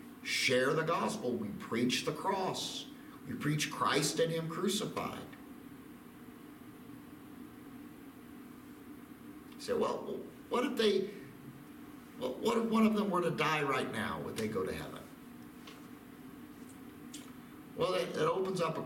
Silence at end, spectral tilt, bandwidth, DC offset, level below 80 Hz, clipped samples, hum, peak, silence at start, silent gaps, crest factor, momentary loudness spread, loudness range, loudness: 0 s; -4.5 dB/octave; 17 kHz; under 0.1%; -68 dBFS; under 0.1%; none; -16 dBFS; 0 s; none; 20 dB; 21 LU; 16 LU; -34 LUFS